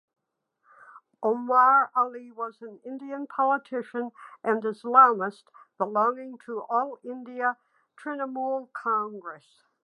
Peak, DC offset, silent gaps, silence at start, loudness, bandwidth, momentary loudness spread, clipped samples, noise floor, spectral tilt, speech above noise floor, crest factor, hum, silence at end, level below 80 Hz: -4 dBFS; under 0.1%; none; 0.95 s; -26 LUFS; 10.5 kHz; 20 LU; under 0.1%; -75 dBFS; -7 dB/octave; 49 dB; 24 dB; none; 0.5 s; under -90 dBFS